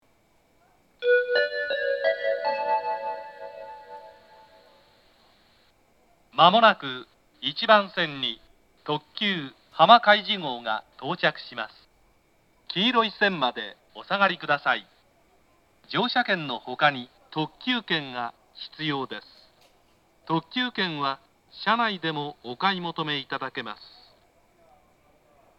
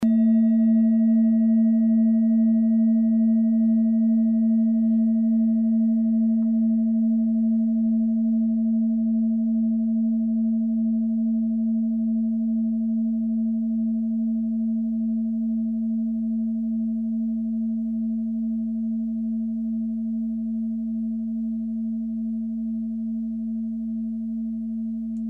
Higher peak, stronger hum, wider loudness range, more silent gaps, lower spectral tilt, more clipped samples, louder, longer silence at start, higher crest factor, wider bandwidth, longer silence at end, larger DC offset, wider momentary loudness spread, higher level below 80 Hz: first, 0 dBFS vs -14 dBFS; neither; about the same, 8 LU vs 8 LU; neither; second, -6 dB/octave vs -11.5 dB/octave; neither; about the same, -25 LUFS vs -23 LUFS; first, 1 s vs 0 s; first, 26 dB vs 8 dB; first, 8 kHz vs 2 kHz; first, 1.75 s vs 0 s; neither; first, 18 LU vs 9 LU; second, -72 dBFS vs -56 dBFS